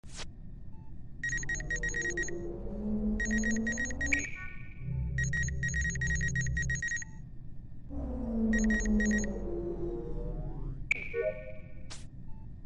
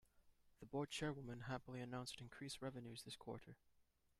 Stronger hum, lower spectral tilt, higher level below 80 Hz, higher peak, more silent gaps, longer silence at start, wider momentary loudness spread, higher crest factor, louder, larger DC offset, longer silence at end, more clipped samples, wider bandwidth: neither; about the same, -5 dB/octave vs -5 dB/octave; first, -40 dBFS vs -74 dBFS; first, -18 dBFS vs -34 dBFS; neither; about the same, 0.05 s vs 0.15 s; first, 20 LU vs 10 LU; about the same, 16 dB vs 18 dB; first, -33 LUFS vs -51 LUFS; neither; second, 0 s vs 0.35 s; neither; second, 10 kHz vs 14 kHz